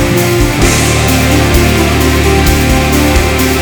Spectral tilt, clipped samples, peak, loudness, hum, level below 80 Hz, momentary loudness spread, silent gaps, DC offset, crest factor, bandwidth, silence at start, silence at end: -4.5 dB/octave; 0.8%; 0 dBFS; -9 LUFS; none; -16 dBFS; 1 LU; none; under 0.1%; 8 dB; over 20 kHz; 0 s; 0 s